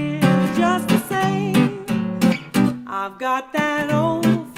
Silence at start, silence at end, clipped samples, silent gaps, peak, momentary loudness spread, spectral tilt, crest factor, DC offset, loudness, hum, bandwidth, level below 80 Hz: 0 s; 0 s; under 0.1%; none; -2 dBFS; 6 LU; -6 dB/octave; 16 dB; under 0.1%; -20 LUFS; none; 16.5 kHz; -54 dBFS